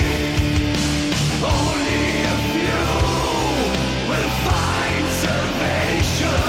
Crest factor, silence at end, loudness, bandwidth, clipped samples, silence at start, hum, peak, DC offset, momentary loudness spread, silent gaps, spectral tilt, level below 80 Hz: 14 dB; 0 s; -19 LUFS; 16.5 kHz; under 0.1%; 0 s; none; -6 dBFS; under 0.1%; 1 LU; none; -4.5 dB/octave; -28 dBFS